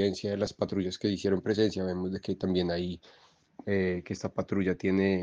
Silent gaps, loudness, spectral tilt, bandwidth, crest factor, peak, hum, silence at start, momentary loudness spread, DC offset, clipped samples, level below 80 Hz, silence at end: none; -31 LUFS; -6.5 dB/octave; 7.8 kHz; 16 dB; -14 dBFS; none; 0 s; 7 LU; under 0.1%; under 0.1%; -64 dBFS; 0 s